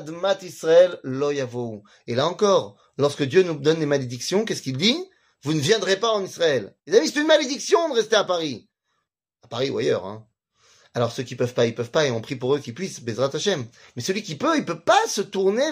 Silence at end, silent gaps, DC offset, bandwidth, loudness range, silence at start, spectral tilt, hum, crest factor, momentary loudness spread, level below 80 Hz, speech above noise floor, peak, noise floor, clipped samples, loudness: 0 s; none; under 0.1%; 15.5 kHz; 5 LU; 0 s; -4 dB/octave; none; 20 dB; 12 LU; -68 dBFS; 55 dB; -4 dBFS; -77 dBFS; under 0.1%; -22 LUFS